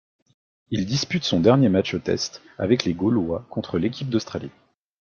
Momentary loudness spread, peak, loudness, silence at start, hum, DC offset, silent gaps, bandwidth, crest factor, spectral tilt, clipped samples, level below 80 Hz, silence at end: 12 LU; -2 dBFS; -23 LUFS; 0.7 s; none; under 0.1%; none; 7.2 kHz; 22 dB; -6 dB/octave; under 0.1%; -56 dBFS; 0.5 s